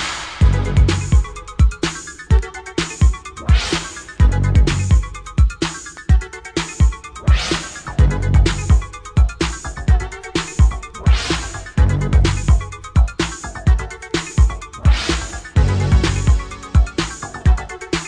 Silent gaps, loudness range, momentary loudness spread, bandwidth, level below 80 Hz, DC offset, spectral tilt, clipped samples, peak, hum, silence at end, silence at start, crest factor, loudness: none; 1 LU; 8 LU; 10 kHz; -18 dBFS; under 0.1%; -5 dB/octave; under 0.1%; -2 dBFS; none; 0 s; 0 s; 14 dB; -18 LUFS